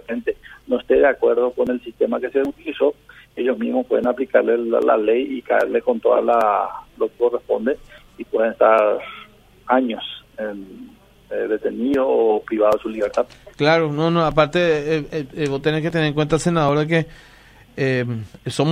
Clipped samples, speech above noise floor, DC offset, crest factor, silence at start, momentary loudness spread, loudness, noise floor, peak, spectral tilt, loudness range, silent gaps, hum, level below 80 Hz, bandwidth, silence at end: under 0.1%; 25 dB; under 0.1%; 18 dB; 0.1 s; 12 LU; -20 LUFS; -44 dBFS; -2 dBFS; -6.5 dB/octave; 3 LU; none; none; -50 dBFS; 13.5 kHz; 0 s